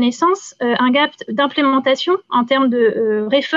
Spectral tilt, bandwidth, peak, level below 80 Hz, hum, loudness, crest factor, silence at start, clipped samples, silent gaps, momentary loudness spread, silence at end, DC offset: -4 dB/octave; 7.6 kHz; -4 dBFS; -68 dBFS; none; -16 LUFS; 12 dB; 0 s; under 0.1%; none; 4 LU; 0 s; under 0.1%